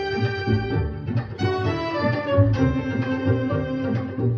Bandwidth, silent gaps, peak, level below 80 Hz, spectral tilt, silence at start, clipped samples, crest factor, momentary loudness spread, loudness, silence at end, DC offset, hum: 6.6 kHz; none; -6 dBFS; -40 dBFS; -8.5 dB/octave; 0 s; under 0.1%; 16 dB; 6 LU; -23 LUFS; 0 s; under 0.1%; none